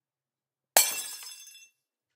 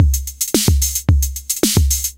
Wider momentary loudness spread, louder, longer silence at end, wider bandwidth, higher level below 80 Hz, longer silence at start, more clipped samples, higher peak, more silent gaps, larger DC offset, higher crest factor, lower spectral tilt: first, 21 LU vs 4 LU; second, -24 LUFS vs -16 LUFS; first, 0.65 s vs 0.05 s; about the same, 16 kHz vs 17 kHz; second, -84 dBFS vs -20 dBFS; first, 0.75 s vs 0 s; neither; about the same, -2 dBFS vs 0 dBFS; neither; neither; first, 30 dB vs 16 dB; second, 2.5 dB/octave vs -4 dB/octave